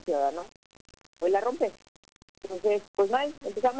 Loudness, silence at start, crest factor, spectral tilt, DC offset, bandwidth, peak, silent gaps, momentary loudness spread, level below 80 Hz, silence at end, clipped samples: -29 LUFS; 0.05 s; 14 dB; -4.5 dB/octave; 0.2%; 8 kHz; -14 dBFS; 0.56-0.70 s, 0.81-0.85 s, 1.06-1.13 s, 1.88-2.03 s, 2.12-2.35 s, 2.88-2.94 s; 14 LU; -66 dBFS; 0 s; under 0.1%